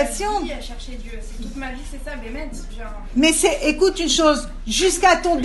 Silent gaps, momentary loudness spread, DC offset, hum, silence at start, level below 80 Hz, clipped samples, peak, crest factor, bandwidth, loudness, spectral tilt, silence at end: none; 19 LU; under 0.1%; none; 0 s; -32 dBFS; under 0.1%; -2 dBFS; 18 dB; 12 kHz; -18 LUFS; -2.5 dB/octave; 0 s